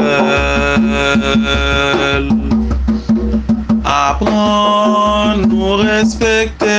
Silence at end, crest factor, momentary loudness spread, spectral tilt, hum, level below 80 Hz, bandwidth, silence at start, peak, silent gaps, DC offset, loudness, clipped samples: 0 s; 12 dB; 4 LU; -5 dB/octave; none; -24 dBFS; 9.2 kHz; 0 s; 0 dBFS; none; under 0.1%; -13 LUFS; under 0.1%